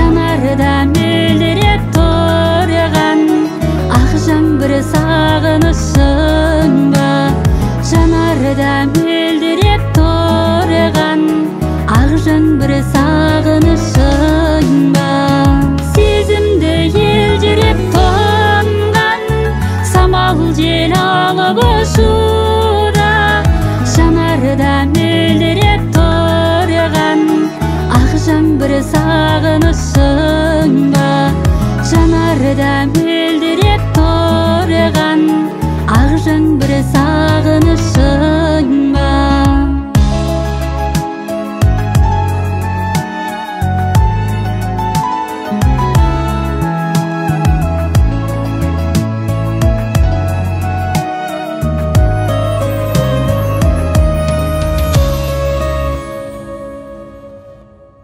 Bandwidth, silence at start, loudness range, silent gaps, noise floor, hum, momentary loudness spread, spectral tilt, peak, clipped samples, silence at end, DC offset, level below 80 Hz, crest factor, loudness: 16 kHz; 0 s; 4 LU; none; -39 dBFS; none; 6 LU; -6.5 dB/octave; 0 dBFS; under 0.1%; 0.5 s; under 0.1%; -18 dBFS; 10 dB; -12 LUFS